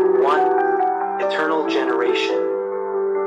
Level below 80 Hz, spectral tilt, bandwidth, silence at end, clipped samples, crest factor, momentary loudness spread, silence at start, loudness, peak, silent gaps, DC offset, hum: -68 dBFS; -4.5 dB/octave; 7.8 kHz; 0 s; under 0.1%; 12 dB; 6 LU; 0 s; -19 LUFS; -8 dBFS; none; under 0.1%; none